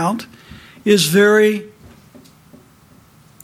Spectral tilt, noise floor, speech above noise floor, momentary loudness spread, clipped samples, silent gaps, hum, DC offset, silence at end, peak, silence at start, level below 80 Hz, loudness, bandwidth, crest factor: -4.5 dB/octave; -48 dBFS; 34 dB; 16 LU; under 0.1%; none; none; under 0.1%; 1.75 s; -2 dBFS; 0 s; -56 dBFS; -15 LUFS; 16 kHz; 16 dB